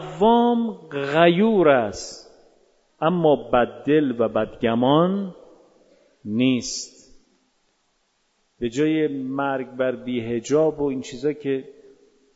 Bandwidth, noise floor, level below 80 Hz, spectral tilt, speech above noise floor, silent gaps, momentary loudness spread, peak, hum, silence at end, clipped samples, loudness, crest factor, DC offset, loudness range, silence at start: 8 kHz; -68 dBFS; -56 dBFS; -5.5 dB/octave; 47 dB; none; 12 LU; -2 dBFS; none; 0.65 s; under 0.1%; -21 LUFS; 20 dB; under 0.1%; 7 LU; 0 s